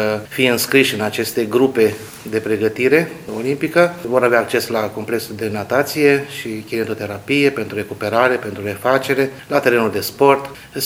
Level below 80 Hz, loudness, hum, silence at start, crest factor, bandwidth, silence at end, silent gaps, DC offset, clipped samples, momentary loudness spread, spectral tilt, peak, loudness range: -56 dBFS; -17 LUFS; none; 0 s; 18 dB; 17 kHz; 0 s; none; under 0.1%; under 0.1%; 10 LU; -4.5 dB/octave; 0 dBFS; 2 LU